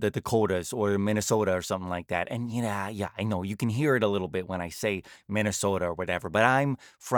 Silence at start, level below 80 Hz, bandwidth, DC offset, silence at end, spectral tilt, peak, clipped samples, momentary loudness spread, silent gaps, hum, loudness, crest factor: 0 s; -62 dBFS; over 20 kHz; under 0.1%; 0 s; -5 dB/octave; -6 dBFS; under 0.1%; 8 LU; none; none; -28 LUFS; 22 dB